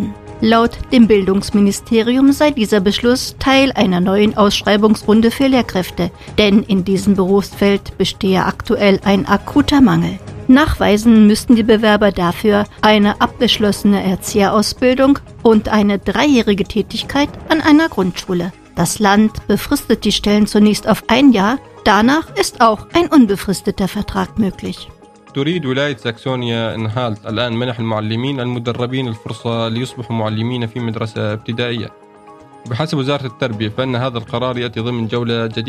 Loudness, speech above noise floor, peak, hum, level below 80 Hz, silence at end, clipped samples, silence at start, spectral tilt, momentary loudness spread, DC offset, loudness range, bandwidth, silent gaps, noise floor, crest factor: -14 LUFS; 26 dB; 0 dBFS; none; -36 dBFS; 0 s; under 0.1%; 0 s; -5.5 dB/octave; 10 LU; under 0.1%; 8 LU; 15 kHz; none; -40 dBFS; 14 dB